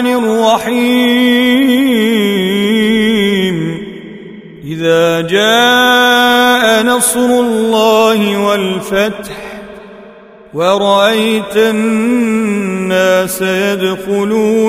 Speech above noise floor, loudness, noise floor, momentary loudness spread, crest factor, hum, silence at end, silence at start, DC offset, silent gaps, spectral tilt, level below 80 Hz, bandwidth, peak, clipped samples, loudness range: 26 dB; -11 LUFS; -36 dBFS; 14 LU; 12 dB; none; 0 s; 0 s; under 0.1%; none; -4 dB/octave; -48 dBFS; 16 kHz; 0 dBFS; under 0.1%; 5 LU